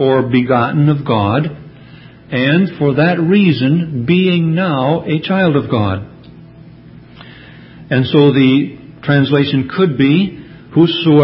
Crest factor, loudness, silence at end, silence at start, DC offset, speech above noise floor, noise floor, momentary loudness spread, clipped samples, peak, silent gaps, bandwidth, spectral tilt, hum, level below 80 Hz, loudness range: 14 dB; -13 LUFS; 0 s; 0 s; under 0.1%; 26 dB; -38 dBFS; 9 LU; under 0.1%; 0 dBFS; none; 5.8 kHz; -11 dB/octave; none; -44 dBFS; 4 LU